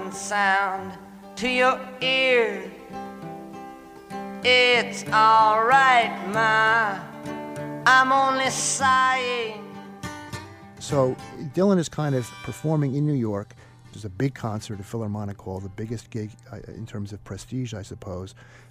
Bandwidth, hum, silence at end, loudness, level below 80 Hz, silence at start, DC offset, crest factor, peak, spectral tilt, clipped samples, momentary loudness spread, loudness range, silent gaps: 15.5 kHz; none; 0.15 s; -21 LUFS; -58 dBFS; 0 s; under 0.1%; 20 dB; -4 dBFS; -4 dB/octave; under 0.1%; 21 LU; 13 LU; none